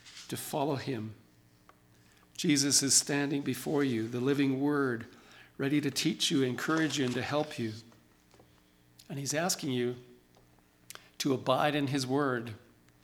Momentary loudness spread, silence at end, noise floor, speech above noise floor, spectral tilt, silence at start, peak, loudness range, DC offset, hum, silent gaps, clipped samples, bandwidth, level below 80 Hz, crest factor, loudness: 19 LU; 0.45 s; -63 dBFS; 33 dB; -3.5 dB/octave; 0.05 s; -10 dBFS; 7 LU; under 0.1%; 60 Hz at -65 dBFS; none; under 0.1%; 19 kHz; -72 dBFS; 22 dB; -30 LUFS